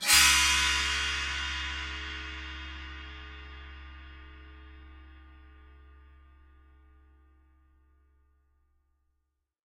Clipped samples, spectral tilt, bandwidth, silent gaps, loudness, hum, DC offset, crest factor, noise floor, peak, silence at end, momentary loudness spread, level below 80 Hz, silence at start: under 0.1%; 0.5 dB/octave; 16 kHz; none; -26 LUFS; none; under 0.1%; 26 dB; -80 dBFS; -8 dBFS; 4.05 s; 28 LU; -46 dBFS; 0 s